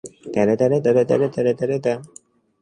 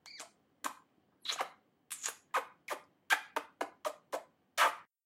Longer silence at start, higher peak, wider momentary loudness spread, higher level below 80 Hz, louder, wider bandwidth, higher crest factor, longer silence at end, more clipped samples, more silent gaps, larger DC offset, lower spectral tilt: about the same, 0.05 s vs 0.05 s; first, -4 dBFS vs -14 dBFS; second, 8 LU vs 14 LU; first, -60 dBFS vs under -90 dBFS; first, -20 LUFS vs -38 LUFS; second, 10.5 kHz vs 16 kHz; second, 16 dB vs 26 dB; first, 0.55 s vs 0.2 s; neither; neither; neither; first, -7.5 dB/octave vs 1 dB/octave